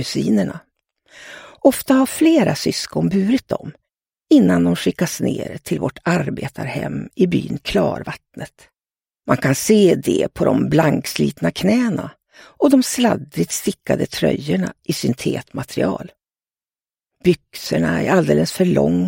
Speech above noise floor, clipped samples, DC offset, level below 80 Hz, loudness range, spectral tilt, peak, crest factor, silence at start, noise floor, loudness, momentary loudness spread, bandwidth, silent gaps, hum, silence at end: over 72 dB; under 0.1%; under 0.1%; -48 dBFS; 5 LU; -5.5 dB/octave; 0 dBFS; 18 dB; 0 s; under -90 dBFS; -18 LUFS; 13 LU; 17 kHz; none; none; 0 s